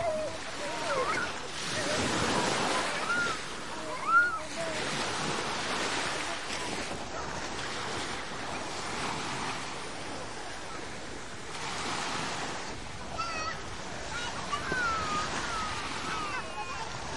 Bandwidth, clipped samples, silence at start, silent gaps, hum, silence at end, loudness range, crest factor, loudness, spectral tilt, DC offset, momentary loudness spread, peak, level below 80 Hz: 11.5 kHz; under 0.1%; 0 s; none; none; 0 s; 7 LU; 20 dB; -33 LUFS; -2.5 dB/octave; 0.7%; 10 LU; -14 dBFS; -54 dBFS